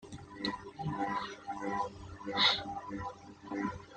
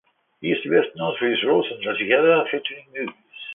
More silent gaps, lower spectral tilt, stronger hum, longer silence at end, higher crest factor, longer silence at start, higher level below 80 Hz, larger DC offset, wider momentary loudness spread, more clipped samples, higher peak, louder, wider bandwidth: neither; second, -4 dB/octave vs -9 dB/octave; neither; about the same, 0 s vs 0 s; first, 24 dB vs 18 dB; second, 0 s vs 0.4 s; first, -62 dBFS vs -70 dBFS; neither; about the same, 16 LU vs 14 LU; neither; second, -14 dBFS vs -4 dBFS; second, -35 LUFS vs -21 LUFS; first, 9.4 kHz vs 3.8 kHz